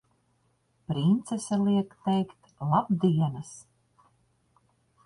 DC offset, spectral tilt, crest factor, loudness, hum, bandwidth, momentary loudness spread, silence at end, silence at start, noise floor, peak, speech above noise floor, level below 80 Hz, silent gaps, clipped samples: under 0.1%; -7.5 dB/octave; 18 dB; -27 LUFS; none; 11.5 kHz; 16 LU; 1.45 s; 0.9 s; -70 dBFS; -10 dBFS; 44 dB; -64 dBFS; none; under 0.1%